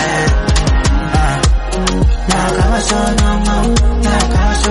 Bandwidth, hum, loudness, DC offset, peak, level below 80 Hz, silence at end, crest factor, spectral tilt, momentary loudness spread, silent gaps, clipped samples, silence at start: 11.5 kHz; none; -14 LUFS; under 0.1%; 0 dBFS; -14 dBFS; 0 s; 12 dB; -5 dB/octave; 2 LU; none; under 0.1%; 0 s